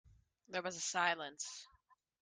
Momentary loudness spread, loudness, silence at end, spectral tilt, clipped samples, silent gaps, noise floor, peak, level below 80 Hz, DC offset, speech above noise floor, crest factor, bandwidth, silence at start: 11 LU; -39 LUFS; 0.55 s; -1 dB/octave; under 0.1%; none; -74 dBFS; -18 dBFS; -78 dBFS; under 0.1%; 33 dB; 24 dB; 10.5 kHz; 0.5 s